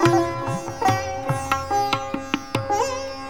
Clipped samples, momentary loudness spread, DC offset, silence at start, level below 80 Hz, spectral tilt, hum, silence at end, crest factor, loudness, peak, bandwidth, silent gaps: under 0.1%; 5 LU; 0.6%; 0 s; -48 dBFS; -5 dB/octave; none; 0 s; 20 dB; -24 LUFS; -2 dBFS; 18.5 kHz; none